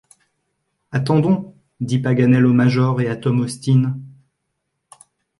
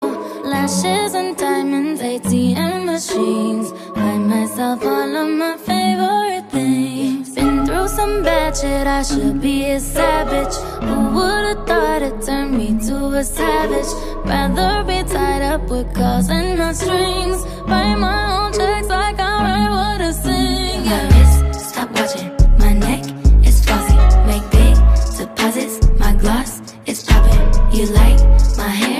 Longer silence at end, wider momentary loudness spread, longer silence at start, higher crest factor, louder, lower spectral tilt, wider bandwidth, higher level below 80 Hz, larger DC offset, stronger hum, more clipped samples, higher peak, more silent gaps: first, 1.3 s vs 0 s; about the same, 10 LU vs 8 LU; first, 0.9 s vs 0 s; about the same, 16 dB vs 14 dB; about the same, -18 LUFS vs -17 LUFS; first, -8 dB/octave vs -5.5 dB/octave; second, 11.5 kHz vs 15.5 kHz; second, -58 dBFS vs -16 dBFS; neither; neither; neither; second, -4 dBFS vs 0 dBFS; neither